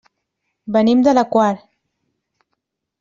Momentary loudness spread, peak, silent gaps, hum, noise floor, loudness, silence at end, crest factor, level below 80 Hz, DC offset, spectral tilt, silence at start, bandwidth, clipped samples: 15 LU; -2 dBFS; none; none; -76 dBFS; -15 LUFS; 1.45 s; 16 dB; -60 dBFS; under 0.1%; -6.5 dB/octave; 0.65 s; 7.4 kHz; under 0.1%